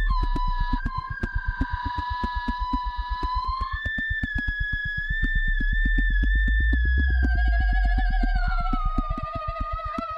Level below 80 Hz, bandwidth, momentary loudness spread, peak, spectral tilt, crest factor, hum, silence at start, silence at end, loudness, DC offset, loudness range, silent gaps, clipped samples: -24 dBFS; 5.4 kHz; 7 LU; -10 dBFS; -7 dB/octave; 14 dB; none; 0 s; 0 s; -27 LUFS; under 0.1%; 5 LU; none; under 0.1%